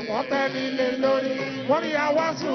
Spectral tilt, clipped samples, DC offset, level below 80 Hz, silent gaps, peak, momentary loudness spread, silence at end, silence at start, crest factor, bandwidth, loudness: -5 dB/octave; under 0.1%; under 0.1%; -66 dBFS; none; -10 dBFS; 3 LU; 0 s; 0 s; 14 dB; 6.4 kHz; -24 LUFS